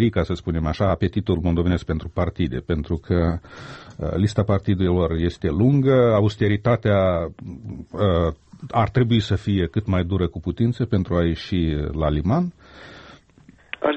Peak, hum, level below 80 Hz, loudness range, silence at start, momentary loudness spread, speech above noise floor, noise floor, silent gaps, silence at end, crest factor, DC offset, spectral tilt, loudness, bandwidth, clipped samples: -6 dBFS; none; -36 dBFS; 4 LU; 0 s; 13 LU; 31 dB; -51 dBFS; none; 0 s; 14 dB; under 0.1%; -8.5 dB/octave; -22 LUFS; 8.4 kHz; under 0.1%